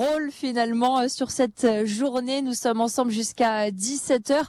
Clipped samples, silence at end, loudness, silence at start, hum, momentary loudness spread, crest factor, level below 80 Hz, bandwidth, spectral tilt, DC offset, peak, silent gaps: under 0.1%; 0 s; -24 LUFS; 0 s; none; 4 LU; 14 dB; -64 dBFS; 14 kHz; -3.5 dB/octave; under 0.1%; -10 dBFS; none